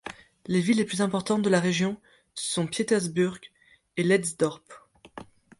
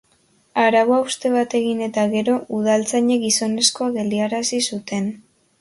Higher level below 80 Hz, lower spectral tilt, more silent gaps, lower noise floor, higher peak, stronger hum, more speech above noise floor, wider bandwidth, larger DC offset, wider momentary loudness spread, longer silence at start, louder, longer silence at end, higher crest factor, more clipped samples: about the same, -66 dBFS vs -64 dBFS; first, -5 dB/octave vs -3 dB/octave; neither; second, -47 dBFS vs -60 dBFS; second, -10 dBFS vs -2 dBFS; neither; second, 21 dB vs 41 dB; about the same, 11.5 kHz vs 11.5 kHz; neither; first, 22 LU vs 7 LU; second, 0.05 s vs 0.55 s; second, -26 LUFS vs -19 LUFS; about the same, 0.35 s vs 0.4 s; about the same, 16 dB vs 18 dB; neither